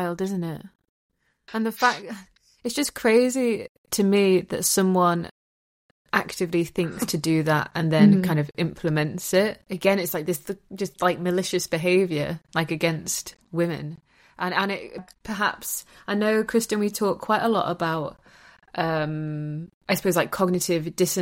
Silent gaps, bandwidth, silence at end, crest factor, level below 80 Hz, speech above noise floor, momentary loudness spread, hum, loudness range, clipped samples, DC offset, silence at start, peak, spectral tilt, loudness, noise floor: 0.89-1.09 s, 3.69-3.84 s, 5.31-6.05 s, 19.74-19.81 s; 16.5 kHz; 0 s; 20 dB; -58 dBFS; over 66 dB; 13 LU; none; 5 LU; under 0.1%; under 0.1%; 0 s; -6 dBFS; -5 dB/octave; -24 LUFS; under -90 dBFS